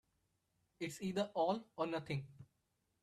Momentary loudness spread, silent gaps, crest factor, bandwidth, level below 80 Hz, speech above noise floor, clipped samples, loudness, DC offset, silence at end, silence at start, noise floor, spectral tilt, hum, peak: 10 LU; none; 18 dB; 13.5 kHz; -78 dBFS; 43 dB; under 0.1%; -41 LUFS; under 0.1%; 0.6 s; 0.8 s; -83 dBFS; -6 dB/octave; none; -24 dBFS